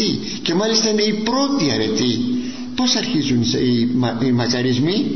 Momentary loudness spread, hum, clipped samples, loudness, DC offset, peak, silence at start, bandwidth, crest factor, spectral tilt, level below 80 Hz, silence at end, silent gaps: 5 LU; none; under 0.1%; -18 LUFS; 1%; -4 dBFS; 0 s; 6.4 kHz; 14 dB; -4.5 dB/octave; -50 dBFS; 0 s; none